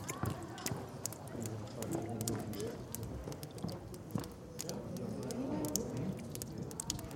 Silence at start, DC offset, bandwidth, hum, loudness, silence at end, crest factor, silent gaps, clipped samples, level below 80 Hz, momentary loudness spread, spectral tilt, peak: 0 s; under 0.1%; 17 kHz; none; -42 LUFS; 0 s; 28 dB; none; under 0.1%; -58 dBFS; 6 LU; -4.5 dB/octave; -14 dBFS